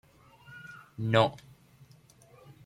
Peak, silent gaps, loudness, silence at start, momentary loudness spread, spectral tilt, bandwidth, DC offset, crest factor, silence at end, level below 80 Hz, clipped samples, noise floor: -8 dBFS; none; -28 LUFS; 0.5 s; 25 LU; -6.5 dB/octave; 13.5 kHz; under 0.1%; 26 dB; 1.3 s; -66 dBFS; under 0.1%; -58 dBFS